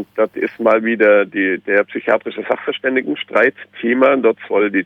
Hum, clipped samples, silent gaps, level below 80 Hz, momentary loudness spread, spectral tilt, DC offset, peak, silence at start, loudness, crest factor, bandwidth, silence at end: none; under 0.1%; none; -66 dBFS; 7 LU; -7 dB/octave; under 0.1%; 0 dBFS; 0 s; -16 LUFS; 16 dB; 4.5 kHz; 0 s